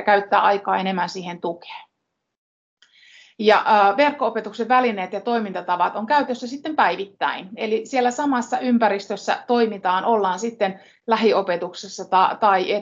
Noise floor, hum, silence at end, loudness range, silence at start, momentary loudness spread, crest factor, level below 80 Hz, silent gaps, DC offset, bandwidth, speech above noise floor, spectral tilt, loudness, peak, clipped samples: -78 dBFS; none; 0 s; 3 LU; 0 s; 11 LU; 18 dB; -74 dBFS; 2.38-2.77 s; under 0.1%; 7.8 kHz; 57 dB; -4.5 dB/octave; -20 LUFS; -2 dBFS; under 0.1%